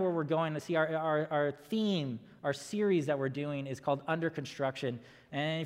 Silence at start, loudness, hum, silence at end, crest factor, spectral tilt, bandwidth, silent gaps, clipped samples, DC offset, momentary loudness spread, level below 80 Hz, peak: 0 s; -34 LUFS; none; 0 s; 16 dB; -6 dB/octave; 16 kHz; none; under 0.1%; under 0.1%; 7 LU; -76 dBFS; -16 dBFS